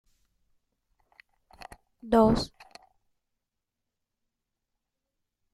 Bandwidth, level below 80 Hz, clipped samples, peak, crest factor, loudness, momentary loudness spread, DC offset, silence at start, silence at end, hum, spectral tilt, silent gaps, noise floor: 13.5 kHz; -52 dBFS; under 0.1%; -10 dBFS; 24 dB; -25 LUFS; 27 LU; under 0.1%; 2.05 s; 3.1 s; none; -6.5 dB/octave; none; -85 dBFS